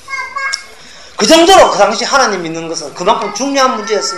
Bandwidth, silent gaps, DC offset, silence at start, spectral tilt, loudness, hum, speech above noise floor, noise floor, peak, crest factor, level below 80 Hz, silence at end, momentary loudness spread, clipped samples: 14.5 kHz; none; 1%; 0.1 s; -2.5 dB/octave; -11 LUFS; none; 25 dB; -36 dBFS; 0 dBFS; 12 dB; -42 dBFS; 0 s; 15 LU; 0.5%